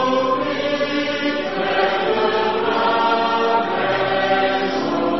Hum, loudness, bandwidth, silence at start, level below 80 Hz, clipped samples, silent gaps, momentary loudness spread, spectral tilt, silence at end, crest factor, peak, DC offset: none; -19 LUFS; 6.2 kHz; 0 s; -52 dBFS; under 0.1%; none; 3 LU; -2 dB/octave; 0 s; 14 dB; -6 dBFS; 0.9%